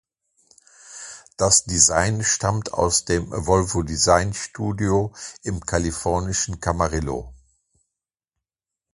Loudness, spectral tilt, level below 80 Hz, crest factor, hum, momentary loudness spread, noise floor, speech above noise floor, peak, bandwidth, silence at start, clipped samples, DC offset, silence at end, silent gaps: -21 LUFS; -3.5 dB/octave; -38 dBFS; 22 dB; none; 15 LU; -87 dBFS; 66 dB; -2 dBFS; 11.5 kHz; 0.85 s; under 0.1%; under 0.1%; 1.6 s; none